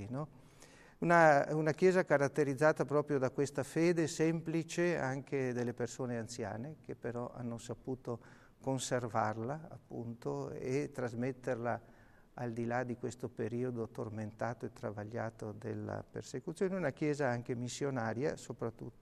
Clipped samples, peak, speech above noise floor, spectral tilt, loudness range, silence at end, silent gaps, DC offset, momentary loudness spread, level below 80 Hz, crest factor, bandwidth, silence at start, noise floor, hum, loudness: under 0.1%; -14 dBFS; 24 dB; -6 dB/octave; 10 LU; 0.1 s; none; under 0.1%; 13 LU; -68 dBFS; 22 dB; 13 kHz; 0 s; -59 dBFS; none; -36 LUFS